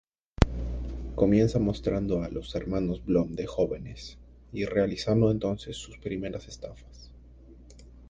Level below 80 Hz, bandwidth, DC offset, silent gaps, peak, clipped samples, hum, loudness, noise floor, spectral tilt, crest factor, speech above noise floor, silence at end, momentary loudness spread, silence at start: -40 dBFS; 9.4 kHz; under 0.1%; none; 0 dBFS; under 0.1%; none; -29 LUFS; -50 dBFS; -7.5 dB/octave; 28 dB; 22 dB; 0 s; 17 LU; 0.4 s